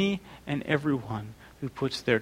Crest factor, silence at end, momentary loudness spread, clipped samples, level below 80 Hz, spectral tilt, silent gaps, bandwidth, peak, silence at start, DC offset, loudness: 20 dB; 0 s; 12 LU; under 0.1%; -58 dBFS; -6 dB/octave; none; 16 kHz; -10 dBFS; 0 s; under 0.1%; -31 LUFS